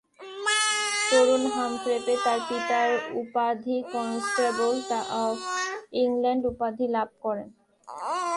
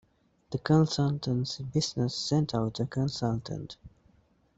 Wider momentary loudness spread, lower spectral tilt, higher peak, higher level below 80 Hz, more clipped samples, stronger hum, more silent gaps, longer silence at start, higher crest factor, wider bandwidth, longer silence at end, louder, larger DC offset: second, 8 LU vs 14 LU; second, -2 dB/octave vs -6 dB/octave; about the same, -10 dBFS vs -12 dBFS; second, -64 dBFS vs -58 dBFS; neither; neither; neither; second, 0.2 s vs 0.5 s; about the same, 18 dB vs 18 dB; first, 11.5 kHz vs 8 kHz; second, 0 s vs 0.7 s; first, -26 LUFS vs -30 LUFS; neither